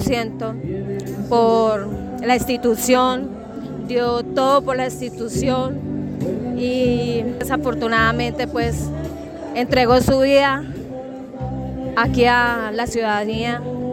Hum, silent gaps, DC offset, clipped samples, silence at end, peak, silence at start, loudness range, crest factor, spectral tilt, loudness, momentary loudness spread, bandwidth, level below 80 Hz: none; none; under 0.1%; under 0.1%; 0 s; -4 dBFS; 0 s; 3 LU; 16 dB; -5 dB/octave; -19 LUFS; 13 LU; 17 kHz; -40 dBFS